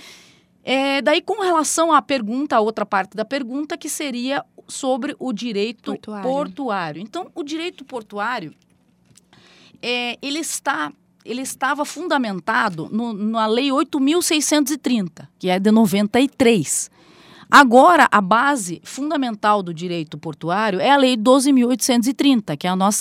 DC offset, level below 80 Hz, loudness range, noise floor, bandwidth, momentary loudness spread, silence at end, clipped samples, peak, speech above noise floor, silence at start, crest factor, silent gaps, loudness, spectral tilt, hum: under 0.1%; -66 dBFS; 11 LU; -57 dBFS; 16.5 kHz; 14 LU; 0 s; under 0.1%; 0 dBFS; 38 dB; 0 s; 20 dB; none; -19 LUFS; -3.5 dB/octave; none